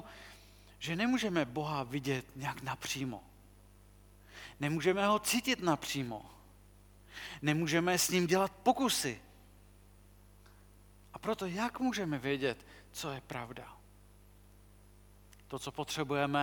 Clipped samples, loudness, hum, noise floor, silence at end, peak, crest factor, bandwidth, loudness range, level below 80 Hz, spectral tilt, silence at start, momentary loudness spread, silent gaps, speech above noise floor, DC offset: under 0.1%; -34 LUFS; 50 Hz at -60 dBFS; -59 dBFS; 0 s; -14 dBFS; 22 dB; 19 kHz; 8 LU; -62 dBFS; -4 dB/octave; 0 s; 18 LU; none; 25 dB; under 0.1%